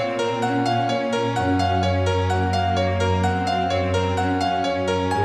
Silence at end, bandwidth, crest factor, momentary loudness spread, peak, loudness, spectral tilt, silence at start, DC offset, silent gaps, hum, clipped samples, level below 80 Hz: 0 s; 11 kHz; 12 dB; 2 LU; -10 dBFS; -21 LUFS; -6 dB/octave; 0 s; under 0.1%; none; none; under 0.1%; -46 dBFS